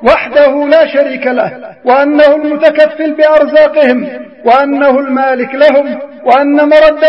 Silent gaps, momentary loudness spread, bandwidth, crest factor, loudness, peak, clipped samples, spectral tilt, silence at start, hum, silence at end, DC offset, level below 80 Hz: none; 9 LU; 5.8 kHz; 8 dB; -8 LUFS; 0 dBFS; 0.8%; -6 dB/octave; 0 s; none; 0 s; 0.3%; -44 dBFS